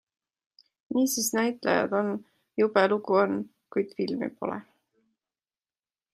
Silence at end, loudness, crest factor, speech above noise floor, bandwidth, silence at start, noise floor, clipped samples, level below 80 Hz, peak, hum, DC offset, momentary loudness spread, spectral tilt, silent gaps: 1.5 s; -27 LUFS; 22 dB; over 64 dB; 16 kHz; 0.9 s; under -90 dBFS; under 0.1%; -76 dBFS; -8 dBFS; none; under 0.1%; 11 LU; -4 dB/octave; none